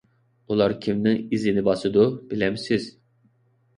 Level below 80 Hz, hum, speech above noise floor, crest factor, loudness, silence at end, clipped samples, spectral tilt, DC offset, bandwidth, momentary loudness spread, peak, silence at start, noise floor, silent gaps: -56 dBFS; none; 41 dB; 18 dB; -23 LUFS; 0.9 s; under 0.1%; -7 dB/octave; under 0.1%; 10.5 kHz; 6 LU; -6 dBFS; 0.5 s; -64 dBFS; none